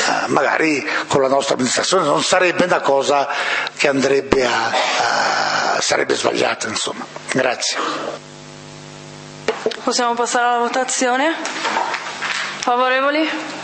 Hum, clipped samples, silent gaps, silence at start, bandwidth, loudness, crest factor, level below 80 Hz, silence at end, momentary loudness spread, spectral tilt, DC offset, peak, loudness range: none; under 0.1%; none; 0 s; 8.8 kHz; -17 LUFS; 18 dB; -52 dBFS; 0 s; 10 LU; -2.5 dB/octave; under 0.1%; 0 dBFS; 5 LU